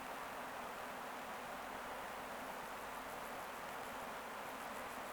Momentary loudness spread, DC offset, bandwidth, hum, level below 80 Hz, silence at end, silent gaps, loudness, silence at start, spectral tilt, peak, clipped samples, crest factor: 0 LU; under 0.1%; over 20 kHz; none; -72 dBFS; 0 s; none; -47 LUFS; 0 s; -2.5 dB/octave; -34 dBFS; under 0.1%; 12 dB